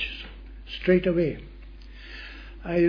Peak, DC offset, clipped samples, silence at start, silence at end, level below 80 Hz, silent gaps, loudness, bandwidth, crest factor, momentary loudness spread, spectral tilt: -8 dBFS; under 0.1%; under 0.1%; 0 s; 0 s; -42 dBFS; none; -25 LUFS; 5.2 kHz; 20 dB; 24 LU; -8.5 dB/octave